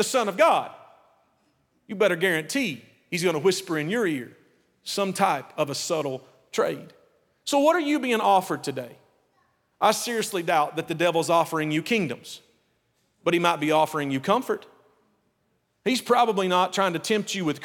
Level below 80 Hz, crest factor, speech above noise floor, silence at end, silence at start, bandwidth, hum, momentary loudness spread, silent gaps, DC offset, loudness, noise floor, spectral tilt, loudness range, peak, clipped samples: -76 dBFS; 20 dB; 47 dB; 0 s; 0 s; 18.5 kHz; none; 12 LU; none; under 0.1%; -24 LUFS; -71 dBFS; -4 dB/octave; 2 LU; -4 dBFS; under 0.1%